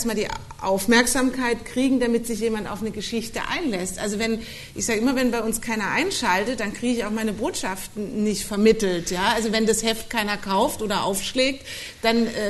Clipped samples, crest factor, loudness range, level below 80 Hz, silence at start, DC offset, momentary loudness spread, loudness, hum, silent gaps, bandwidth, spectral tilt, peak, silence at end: under 0.1%; 18 dB; 3 LU; -44 dBFS; 0 s; under 0.1%; 9 LU; -23 LUFS; none; none; 12.5 kHz; -3.5 dB/octave; -4 dBFS; 0 s